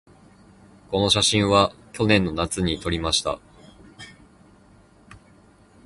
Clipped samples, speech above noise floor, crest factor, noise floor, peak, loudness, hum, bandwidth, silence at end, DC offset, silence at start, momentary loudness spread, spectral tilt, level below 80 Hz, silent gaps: under 0.1%; 32 dB; 22 dB; -53 dBFS; -2 dBFS; -21 LUFS; none; 11.5 kHz; 0.7 s; under 0.1%; 0.9 s; 25 LU; -4 dB/octave; -44 dBFS; none